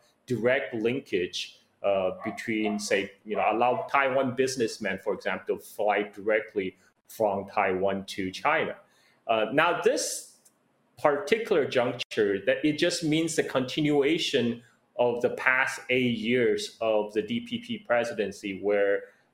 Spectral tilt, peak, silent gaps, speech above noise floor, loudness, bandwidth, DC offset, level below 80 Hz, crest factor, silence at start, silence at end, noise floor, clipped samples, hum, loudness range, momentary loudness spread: -4 dB/octave; -4 dBFS; 12.05-12.10 s; 40 dB; -27 LUFS; 16.5 kHz; under 0.1%; -70 dBFS; 22 dB; 0.3 s; 0.3 s; -67 dBFS; under 0.1%; none; 3 LU; 8 LU